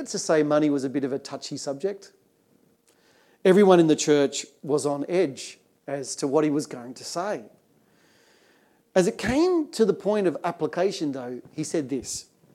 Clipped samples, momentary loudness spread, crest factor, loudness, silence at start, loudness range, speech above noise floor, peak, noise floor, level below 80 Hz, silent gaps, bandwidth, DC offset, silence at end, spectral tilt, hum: under 0.1%; 15 LU; 22 dB; -24 LUFS; 0 s; 6 LU; 39 dB; -4 dBFS; -63 dBFS; -60 dBFS; none; 14 kHz; under 0.1%; 0.3 s; -5 dB/octave; none